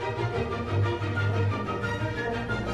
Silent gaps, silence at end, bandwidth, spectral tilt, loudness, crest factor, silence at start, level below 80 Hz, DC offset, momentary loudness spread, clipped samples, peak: none; 0 s; 9 kHz; -7 dB/octave; -29 LUFS; 12 dB; 0 s; -46 dBFS; under 0.1%; 3 LU; under 0.1%; -16 dBFS